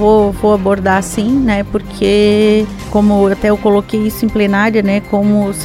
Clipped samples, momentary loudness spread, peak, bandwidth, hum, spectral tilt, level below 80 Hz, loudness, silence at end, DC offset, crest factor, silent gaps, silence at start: under 0.1%; 5 LU; 0 dBFS; 15.5 kHz; none; -6 dB/octave; -32 dBFS; -12 LUFS; 0 s; under 0.1%; 12 dB; none; 0 s